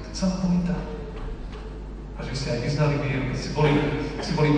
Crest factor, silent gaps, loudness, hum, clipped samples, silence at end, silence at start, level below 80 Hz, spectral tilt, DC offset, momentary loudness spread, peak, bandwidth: 16 dB; none; -26 LUFS; none; under 0.1%; 0 s; 0 s; -36 dBFS; -6.5 dB/octave; under 0.1%; 16 LU; -8 dBFS; 9.6 kHz